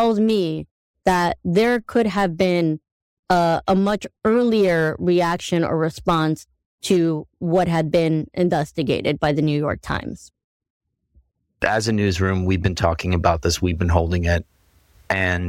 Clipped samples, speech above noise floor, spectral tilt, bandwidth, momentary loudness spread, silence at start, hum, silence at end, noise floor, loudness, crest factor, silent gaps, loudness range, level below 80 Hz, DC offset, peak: under 0.1%; 40 dB; -6 dB/octave; 16 kHz; 6 LU; 0 s; none; 0 s; -60 dBFS; -20 LUFS; 18 dB; 0.71-0.94 s, 2.92-3.23 s, 6.66-6.78 s, 10.44-10.60 s, 10.70-10.80 s; 4 LU; -38 dBFS; under 0.1%; -2 dBFS